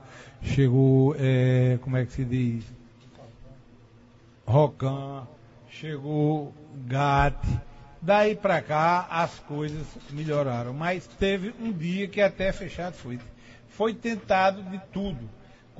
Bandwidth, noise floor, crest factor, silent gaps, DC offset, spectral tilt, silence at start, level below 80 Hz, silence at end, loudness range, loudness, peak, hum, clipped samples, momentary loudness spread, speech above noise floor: 8 kHz; -54 dBFS; 18 dB; none; under 0.1%; -7.5 dB/octave; 0 s; -44 dBFS; 0.5 s; 5 LU; -26 LUFS; -8 dBFS; none; under 0.1%; 17 LU; 29 dB